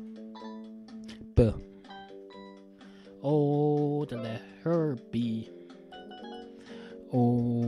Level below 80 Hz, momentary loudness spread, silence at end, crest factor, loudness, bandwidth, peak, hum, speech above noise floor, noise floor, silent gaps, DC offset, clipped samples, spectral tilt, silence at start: -46 dBFS; 22 LU; 0 s; 22 dB; -29 LUFS; 10.5 kHz; -10 dBFS; none; 23 dB; -51 dBFS; none; under 0.1%; under 0.1%; -9.5 dB/octave; 0 s